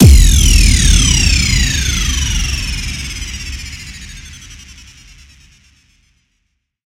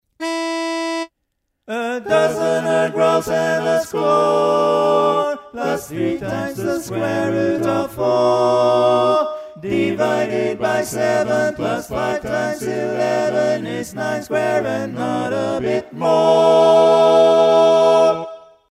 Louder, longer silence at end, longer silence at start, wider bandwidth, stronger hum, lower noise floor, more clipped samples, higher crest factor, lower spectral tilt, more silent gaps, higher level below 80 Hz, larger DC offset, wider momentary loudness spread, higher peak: first, -12 LUFS vs -17 LUFS; first, 2.3 s vs 0.3 s; second, 0 s vs 0.2 s; about the same, 16.5 kHz vs 15 kHz; neither; second, -67 dBFS vs -73 dBFS; first, 0.4% vs under 0.1%; about the same, 14 dB vs 16 dB; second, -3 dB/octave vs -5 dB/octave; neither; first, -16 dBFS vs -54 dBFS; neither; first, 22 LU vs 11 LU; about the same, 0 dBFS vs -2 dBFS